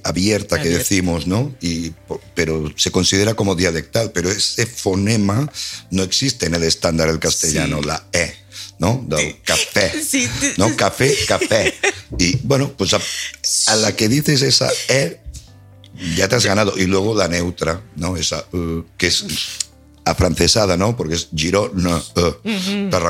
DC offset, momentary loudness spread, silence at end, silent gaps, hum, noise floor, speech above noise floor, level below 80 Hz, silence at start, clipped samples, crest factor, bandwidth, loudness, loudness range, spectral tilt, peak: under 0.1%; 9 LU; 0 s; none; none; -43 dBFS; 25 dB; -38 dBFS; 0.05 s; under 0.1%; 18 dB; 16.5 kHz; -17 LUFS; 2 LU; -3.5 dB/octave; 0 dBFS